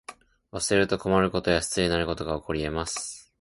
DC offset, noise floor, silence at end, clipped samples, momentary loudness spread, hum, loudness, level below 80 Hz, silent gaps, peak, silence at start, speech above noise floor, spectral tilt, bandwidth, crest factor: under 0.1%; -48 dBFS; 0.2 s; under 0.1%; 10 LU; none; -26 LUFS; -44 dBFS; none; -8 dBFS; 0.1 s; 22 dB; -4 dB/octave; 11.5 kHz; 20 dB